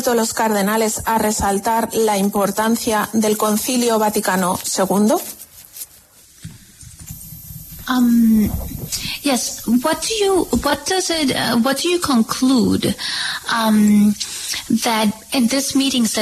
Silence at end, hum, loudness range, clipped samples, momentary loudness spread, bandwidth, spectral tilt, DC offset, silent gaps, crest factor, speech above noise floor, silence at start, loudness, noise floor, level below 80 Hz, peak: 0 s; none; 4 LU; under 0.1%; 16 LU; 14 kHz; -4 dB/octave; under 0.1%; none; 14 dB; 31 dB; 0 s; -17 LUFS; -47 dBFS; -42 dBFS; -4 dBFS